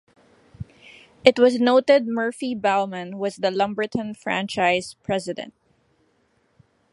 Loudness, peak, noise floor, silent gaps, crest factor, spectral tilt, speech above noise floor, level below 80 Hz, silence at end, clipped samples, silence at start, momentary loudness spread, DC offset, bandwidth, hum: -22 LUFS; 0 dBFS; -65 dBFS; none; 22 dB; -5 dB/octave; 44 dB; -60 dBFS; 1.45 s; under 0.1%; 0.6 s; 18 LU; under 0.1%; 11.5 kHz; none